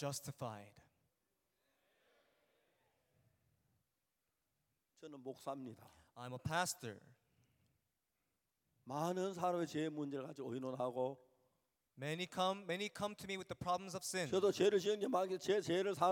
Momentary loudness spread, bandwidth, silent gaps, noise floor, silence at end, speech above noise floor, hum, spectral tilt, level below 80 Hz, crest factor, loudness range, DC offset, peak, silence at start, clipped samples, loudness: 16 LU; 17 kHz; none; -89 dBFS; 0 s; 48 dB; none; -4.5 dB/octave; -80 dBFS; 20 dB; 17 LU; under 0.1%; -22 dBFS; 0 s; under 0.1%; -41 LUFS